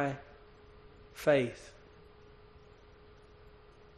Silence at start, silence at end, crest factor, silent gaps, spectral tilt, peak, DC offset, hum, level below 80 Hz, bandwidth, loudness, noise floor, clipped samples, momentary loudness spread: 0 s; 2.3 s; 24 dB; none; -6 dB/octave; -14 dBFS; under 0.1%; none; -62 dBFS; 10 kHz; -32 LUFS; -57 dBFS; under 0.1%; 29 LU